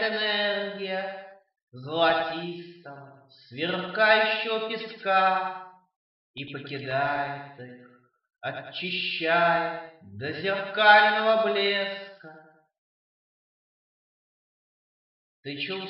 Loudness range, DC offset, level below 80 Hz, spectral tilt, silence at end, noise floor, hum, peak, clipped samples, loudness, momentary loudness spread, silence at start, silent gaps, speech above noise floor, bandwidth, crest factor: 10 LU; under 0.1%; -76 dBFS; -7 dB/octave; 0 s; -53 dBFS; none; -4 dBFS; under 0.1%; -25 LUFS; 23 LU; 0 s; 1.63-1.67 s, 5.96-6.34 s, 12.78-15.43 s; 27 dB; 5.8 kHz; 24 dB